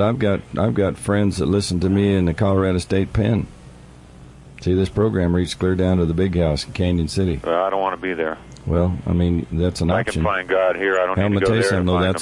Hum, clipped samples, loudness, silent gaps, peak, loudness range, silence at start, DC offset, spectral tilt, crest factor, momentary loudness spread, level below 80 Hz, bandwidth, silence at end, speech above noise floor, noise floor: none; under 0.1%; -20 LUFS; none; -8 dBFS; 2 LU; 0 s; under 0.1%; -6.5 dB/octave; 12 dB; 4 LU; -40 dBFS; 11.5 kHz; 0 s; 24 dB; -42 dBFS